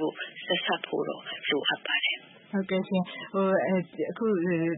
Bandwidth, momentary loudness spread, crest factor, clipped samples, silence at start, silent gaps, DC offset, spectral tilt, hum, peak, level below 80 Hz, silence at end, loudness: 4 kHz; 8 LU; 16 dB; under 0.1%; 0 s; none; under 0.1%; -9.5 dB/octave; none; -14 dBFS; -78 dBFS; 0 s; -29 LUFS